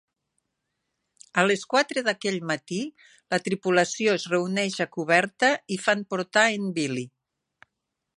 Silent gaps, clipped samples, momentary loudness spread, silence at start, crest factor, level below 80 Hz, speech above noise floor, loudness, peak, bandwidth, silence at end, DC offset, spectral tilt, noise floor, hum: none; under 0.1%; 8 LU; 1.35 s; 22 dB; -76 dBFS; 57 dB; -25 LUFS; -4 dBFS; 11.5 kHz; 1.1 s; under 0.1%; -4 dB/octave; -82 dBFS; none